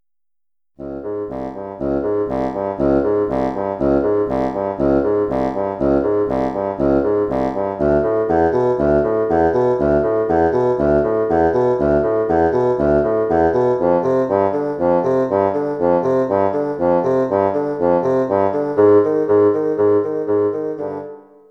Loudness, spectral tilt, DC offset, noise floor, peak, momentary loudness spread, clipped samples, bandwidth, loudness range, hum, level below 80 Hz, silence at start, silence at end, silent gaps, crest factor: -17 LUFS; -9.5 dB/octave; under 0.1%; -90 dBFS; -2 dBFS; 6 LU; under 0.1%; 6.4 kHz; 3 LU; none; -40 dBFS; 0.8 s; 0.3 s; none; 16 dB